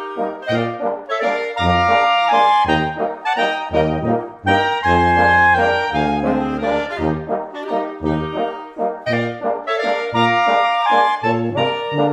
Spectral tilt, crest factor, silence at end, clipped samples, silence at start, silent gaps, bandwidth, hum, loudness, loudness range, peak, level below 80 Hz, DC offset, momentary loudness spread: -6 dB/octave; 14 dB; 0 s; under 0.1%; 0 s; none; 9.2 kHz; none; -17 LUFS; 5 LU; -4 dBFS; -42 dBFS; under 0.1%; 9 LU